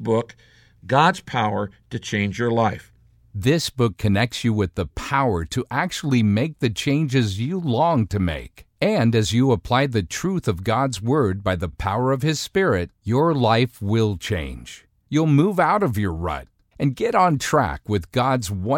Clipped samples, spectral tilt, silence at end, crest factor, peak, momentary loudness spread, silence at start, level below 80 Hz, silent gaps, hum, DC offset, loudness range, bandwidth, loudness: under 0.1%; -6 dB/octave; 0 s; 18 dB; -2 dBFS; 8 LU; 0 s; -42 dBFS; none; none; under 0.1%; 2 LU; 17 kHz; -21 LUFS